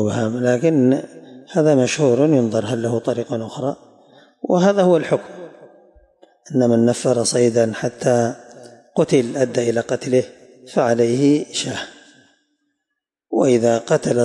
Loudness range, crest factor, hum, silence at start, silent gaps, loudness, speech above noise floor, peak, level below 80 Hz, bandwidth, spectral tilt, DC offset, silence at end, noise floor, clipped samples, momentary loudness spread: 3 LU; 14 dB; none; 0 s; none; -18 LUFS; 63 dB; -4 dBFS; -64 dBFS; 11.5 kHz; -5.5 dB/octave; under 0.1%; 0 s; -80 dBFS; under 0.1%; 11 LU